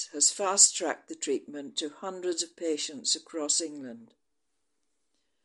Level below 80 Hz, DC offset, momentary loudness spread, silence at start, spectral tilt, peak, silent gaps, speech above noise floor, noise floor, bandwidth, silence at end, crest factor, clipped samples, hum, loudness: -86 dBFS; under 0.1%; 16 LU; 0 s; 0 dB/octave; -6 dBFS; none; 53 dB; -83 dBFS; 11.5 kHz; 1.4 s; 26 dB; under 0.1%; none; -27 LUFS